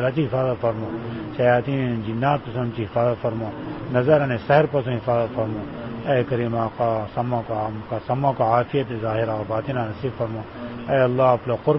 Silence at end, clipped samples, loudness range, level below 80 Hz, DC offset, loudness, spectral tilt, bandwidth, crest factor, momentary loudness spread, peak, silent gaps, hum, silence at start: 0 s; under 0.1%; 3 LU; -50 dBFS; 0.1%; -23 LUFS; -12 dB/octave; 5.8 kHz; 18 dB; 11 LU; -4 dBFS; none; none; 0 s